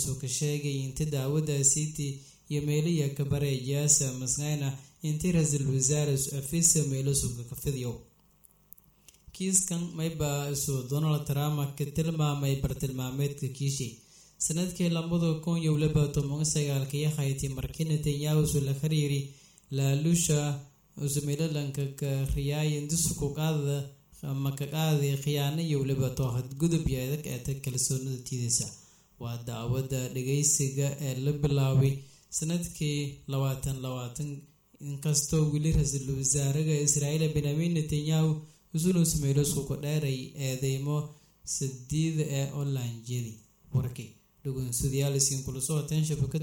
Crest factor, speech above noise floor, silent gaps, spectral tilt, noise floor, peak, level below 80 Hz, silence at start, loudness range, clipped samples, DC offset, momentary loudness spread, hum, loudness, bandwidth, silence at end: 18 dB; 33 dB; none; -5 dB/octave; -62 dBFS; -10 dBFS; -48 dBFS; 0 s; 4 LU; under 0.1%; under 0.1%; 10 LU; none; -29 LUFS; over 20 kHz; 0 s